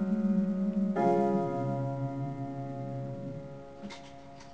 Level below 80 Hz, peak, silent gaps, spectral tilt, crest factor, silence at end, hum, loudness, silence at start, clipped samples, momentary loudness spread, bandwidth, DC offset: -62 dBFS; -14 dBFS; none; -9 dB/octave; 18 dB; 0 s; none; -32 LUFS; 0 s; under 0.1%; 18 LU; 8 kHz; 0.2%